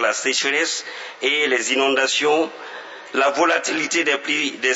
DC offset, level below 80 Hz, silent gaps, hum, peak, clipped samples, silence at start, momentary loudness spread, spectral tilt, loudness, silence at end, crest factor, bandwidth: under 0.1%; -84 dBFS; none; none; -4 dBFS; under 0.1%; 0 s; 9 LU; -0.5 dB/octave; -19 LUFS; 0 s; 16 dB; 8.2 kHz